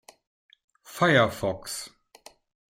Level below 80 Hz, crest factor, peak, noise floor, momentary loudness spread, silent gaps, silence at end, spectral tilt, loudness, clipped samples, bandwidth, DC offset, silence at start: -60 dBFS; 22 dB; -6 dBFS; -54 dBFS; 22 LU; none; 0.8 s; -4.5 dB/octave; -25 LUFS; under 0.1%; 16.5 kHz; under 0.1%; 0.9 s